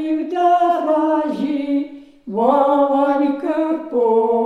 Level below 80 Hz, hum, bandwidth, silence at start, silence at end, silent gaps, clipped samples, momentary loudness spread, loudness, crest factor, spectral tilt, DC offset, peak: -64 dBFS; none; 7.6 kHz; 0 s; 0 s; none; under 0.1%; 7 LU; -17 LUFS; 14 dB; -7 dB/octave; under 0.1%; -2 dBFS